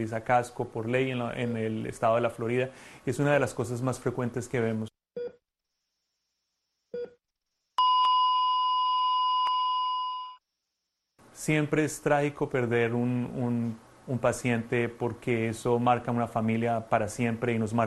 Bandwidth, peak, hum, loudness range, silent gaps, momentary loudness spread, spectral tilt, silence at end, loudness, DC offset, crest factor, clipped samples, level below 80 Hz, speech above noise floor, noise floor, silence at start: 12.5 kHz; -10 dBFS; none; 8 LU; none; 11 LU; -5.5 dB/octave; 0 s; -28 LUFS; under 0.1%; 20 dB; under 0.1%; -60 dBFS; 56 dB; -84 dBFS; 0 s